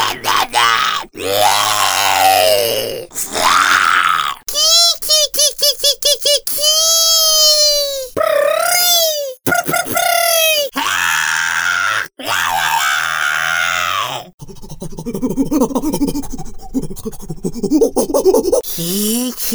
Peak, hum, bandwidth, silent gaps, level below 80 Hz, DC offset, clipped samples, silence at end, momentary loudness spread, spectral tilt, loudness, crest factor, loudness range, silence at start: 0 dBFS; none; over 20 kHz; 14.34-14.38 s; -38 dBFS; under 0.1%; under 0.1%; 0 s; 13 LU; -1 dB/octave; -13 LUFS; 14 dB; 8 LU; 0 s